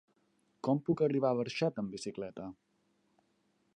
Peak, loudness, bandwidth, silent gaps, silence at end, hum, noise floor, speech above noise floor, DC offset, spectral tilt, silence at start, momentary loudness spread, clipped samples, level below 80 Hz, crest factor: -18 dBFS; -34 LUFS; 11 kHz; none; 1.25 s; none; -75 dBFS; 42 dB; under 0.1%; -6.5 dB/octave; 0.65 s; 13 LU; under 0.1%; -74 dBFS; 18 dB